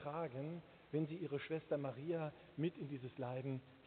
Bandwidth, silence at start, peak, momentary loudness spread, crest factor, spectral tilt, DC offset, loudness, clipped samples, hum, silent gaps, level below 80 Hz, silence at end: 4.5 kHz; 0 s; -28 dBFS; 6 LU; 16 dB; -7 dB/octave; under 0.1%; -45 LUFS; under 0.1%; none; none; -80 dBFS; 0 s